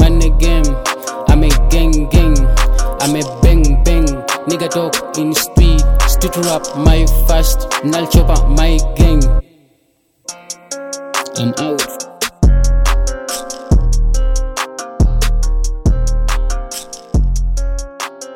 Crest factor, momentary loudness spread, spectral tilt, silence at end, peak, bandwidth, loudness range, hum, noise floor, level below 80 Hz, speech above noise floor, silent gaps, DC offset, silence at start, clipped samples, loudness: 12 dB; 10 LU; -5 dB/octave; 0 s; 0 dBFS; 17 kHz; 5 LU; none; -58 dBFS; -12 dBFS; 47 dB; none; under 0.1%; 0 s; under 0.1%; -15 LUFS